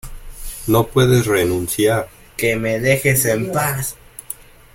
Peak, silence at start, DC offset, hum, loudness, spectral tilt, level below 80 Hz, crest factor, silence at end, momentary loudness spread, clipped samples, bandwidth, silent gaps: -2 dBFS; 0.05 s; under 0.1%; none; -17 LUFS; -5 dB/octave; -38 dBFS; 16 dB; 0.4 s; 18 LU; under 0.1%; 17 kHz; none